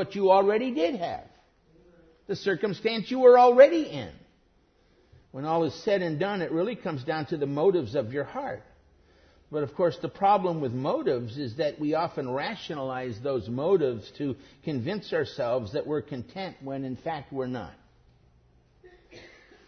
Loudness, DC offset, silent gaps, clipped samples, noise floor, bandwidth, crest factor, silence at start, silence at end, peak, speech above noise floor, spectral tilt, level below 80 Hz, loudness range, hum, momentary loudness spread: -27 LUFS; under 0.1%; none; under 0.1%; -64 dBFS; 6.4 kHz; 24 dB; 0 s; 0.4 s; -4 dBFS; 38 dB; -7 dB/octave; -64 dBFS; 10 LU; none; 15 LU